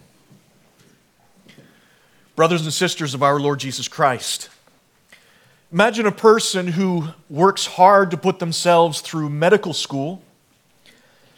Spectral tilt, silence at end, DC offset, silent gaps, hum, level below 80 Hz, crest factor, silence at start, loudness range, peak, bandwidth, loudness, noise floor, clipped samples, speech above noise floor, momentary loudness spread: -4.5 dB/octave; 1.2 s; under 0.1%; none; none; -70 dBFS; 20 dB; 2.35 s; 6 LU; 0 dBFS; 18 kHz; -18 LUFS; -58 dBFS; under 0.1%; 41 dB; 12 LU